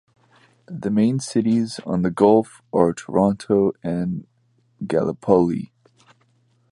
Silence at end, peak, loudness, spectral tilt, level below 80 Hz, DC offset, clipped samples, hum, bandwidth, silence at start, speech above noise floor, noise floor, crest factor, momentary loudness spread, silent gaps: 1.05 s; -2 dBFS; -21 LUFS; -7.5 dB/octave; -54 dBFS; under 0.1%; under 0.1%; none; 11.5 kHz; 0.7 s; 43 dB; -63 dBFS; 20 dB; 13 LU; none